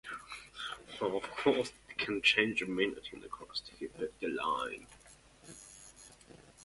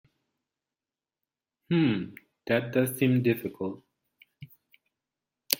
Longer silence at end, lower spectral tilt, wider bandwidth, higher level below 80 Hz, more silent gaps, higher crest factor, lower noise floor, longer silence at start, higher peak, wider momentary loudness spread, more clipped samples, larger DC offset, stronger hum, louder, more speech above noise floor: about the same, 0 s vs 0 s; second, -3.5 dB/octave vs -5.5 dB/octave; second, 11.5 kHz vs 16.5 kHz; about the same, -66 dBFS vs -70 dBFS; neither; about the same, 26 dB vs 30 dB; second, -60 dBFS vs under -90 dBFS; second, 0.05 s vs 1.7 s; second, -12 dBFS vs 0 dBFS; first, 23 LU vs 16 LU; neither; neither; neither; second, -34 LUFS vs -28 LUFS; second, 25 dB vs over 64 dB